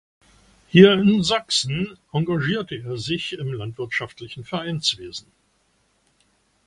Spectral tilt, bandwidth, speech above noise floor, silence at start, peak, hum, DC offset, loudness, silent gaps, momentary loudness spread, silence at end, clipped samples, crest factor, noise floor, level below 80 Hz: -5 dB/octave; 11 kHz; 44 dB; 0.75 s; 0 dBFS; none; under 0.1%; -21 LUFS; none; 17 LU; 1.45 s; under 0.1%; 22 dB; -65 dBFS; -54 dBFS